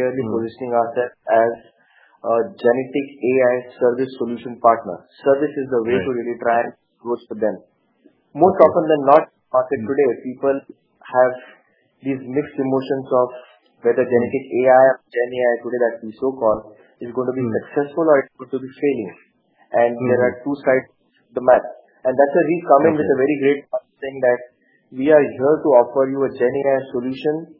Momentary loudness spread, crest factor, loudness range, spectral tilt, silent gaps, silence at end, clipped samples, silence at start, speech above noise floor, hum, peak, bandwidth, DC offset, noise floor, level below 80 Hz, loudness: 12 LU; 18 dB; 4 LU; -10.5 dB/octave; none; 0.15 s; under 0.1%; 0 s; 39 dB; none; 0 dBFS; 5.4 kHz; under 0.1%; -57 dBFS; -64 dBFS; -19 LUFS